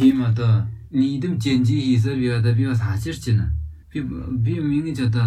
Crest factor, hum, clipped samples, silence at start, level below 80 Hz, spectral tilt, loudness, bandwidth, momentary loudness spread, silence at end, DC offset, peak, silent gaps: 14 dB; none; under 0.1%; 0 s; -38 dBFS; -7.5 dB/octave; -21 LUFS; 10.5 kHz; 8 LU; 0 s; under 0.1%; -6 dBFS; none